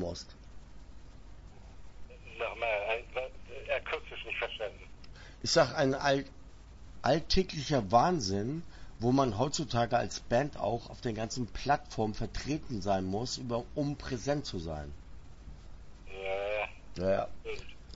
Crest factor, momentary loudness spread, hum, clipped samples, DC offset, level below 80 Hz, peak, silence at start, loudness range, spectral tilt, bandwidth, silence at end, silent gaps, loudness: 22 dB; 20 LU; none; under 0.1%; under 0.1%; -48 dBFS; -12 dBFS; 0 s; 7 LU; -5 dB/octave; 8 kHz; 0 s; none; -33 LUFS